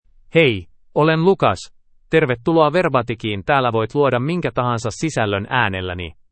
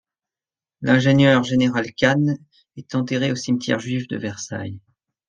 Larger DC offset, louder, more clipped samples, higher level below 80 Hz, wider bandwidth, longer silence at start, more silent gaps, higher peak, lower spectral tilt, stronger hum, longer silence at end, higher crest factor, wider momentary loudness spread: neither; about the same, -18 LUFS vs -20 LUFS; neither; first, -48 dBFS vs -56 dBFS; about the same, 8.8 kHz vs 9.2 kHz; second, 0.35 s vs 0.8 s; neither; about the same, 0 dBFS vs -2 dBFS; about the same, -6 dB/octave vs -6 dB/octave; neither; second, 0.2 s vs 0.5 s; about the same, 18 dB vs 18 dB; second, 9 LU vs 14 LU